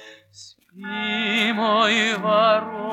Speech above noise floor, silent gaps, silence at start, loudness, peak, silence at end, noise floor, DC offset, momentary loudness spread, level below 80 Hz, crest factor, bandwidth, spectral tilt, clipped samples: 29 dB; none; 0 s; -19 LUFS; -6 dBFS; 0 s; -48 dBFS; under 0.1%; 10 LU; -76 dBFS; 16 dB; 14 kHz; -3.5 dB/octave; under 0.1%